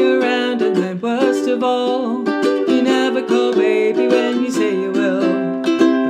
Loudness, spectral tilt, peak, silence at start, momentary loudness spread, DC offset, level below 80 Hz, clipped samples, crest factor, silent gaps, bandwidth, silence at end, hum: -17 LUFS; -5 dB/octave; -2 dBFS; 0 s; 4 LU; under 0.1%; -70 dBFS; under 0.1%; 14 dB; none; 10.5 kHz; 0 s; none